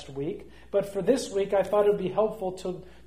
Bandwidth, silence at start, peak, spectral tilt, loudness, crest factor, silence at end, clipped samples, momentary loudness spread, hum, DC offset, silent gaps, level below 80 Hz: 15.5 kHz; 0 s; -10 dBFS; -5.5 dB/octave; -27 LUFS; 18 dB; 0.2 s; under 0.1%; 12 LU; none; 0.3%; none; -56 dBFS